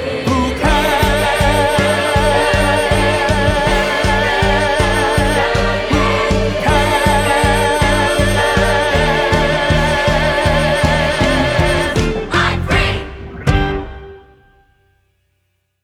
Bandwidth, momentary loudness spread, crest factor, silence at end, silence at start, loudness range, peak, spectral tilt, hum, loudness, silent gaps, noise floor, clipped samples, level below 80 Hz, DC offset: 16 kHz; 3 LU; 14 dB; 1.65 s; 0 s; 4 LU; 0 dBFS; -5 dB/octave; none; -14 LUFS; none; -66 dBFS; under 0.1%; -24 dBFS; under 0.1%